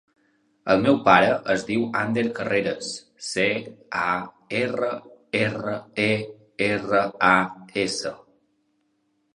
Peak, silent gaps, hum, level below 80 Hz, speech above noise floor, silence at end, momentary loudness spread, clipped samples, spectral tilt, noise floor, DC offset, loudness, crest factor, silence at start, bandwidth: -2 dBFS; none; none; -60 dBFS; 47 dB; 1.2 s; 12 LU; under 0.1%; -4.5 dB/octave; -70 dBFS; under 0.1%; -23 LUFS; 24 dB; 0.65 s; 11.5 kHz